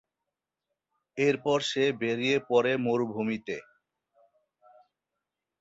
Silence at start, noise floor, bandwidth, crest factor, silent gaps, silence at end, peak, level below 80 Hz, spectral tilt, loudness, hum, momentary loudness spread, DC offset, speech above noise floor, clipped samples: 1.15 s; -87 dBFS; 8 kHz; 20 dB; none; 2 s; -12 dBFS; -72 dBFS; -5 dB/octave; -28 LUFS; none; 11 LU; under 0.1%; 60 dB; under 0.1%